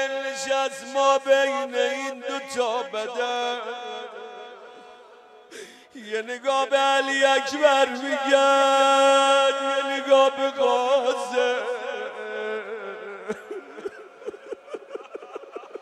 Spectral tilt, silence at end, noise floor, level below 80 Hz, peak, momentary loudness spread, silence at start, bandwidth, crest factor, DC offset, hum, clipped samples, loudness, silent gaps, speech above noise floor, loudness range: -1 dB/octave; 0 s; -49 dBFS; -80 dBFS; -4 dBFS; 21 LU; 0 s; 13 kHz; 18 dB; under 0.1%; none; under 0.1%; -22 LUFS; none; 28 dB; 14 LU